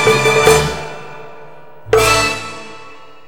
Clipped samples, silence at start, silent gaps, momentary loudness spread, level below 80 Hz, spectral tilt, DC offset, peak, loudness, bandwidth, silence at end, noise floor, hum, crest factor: under 0.1%; 0 s; none; 22 LU; -36 dBFS; -3 dB/octave; 2%; 0 dBFS; -13 LUFS; 19.5 kHz; 0.35 s; -39 dBFS; none; 16 dB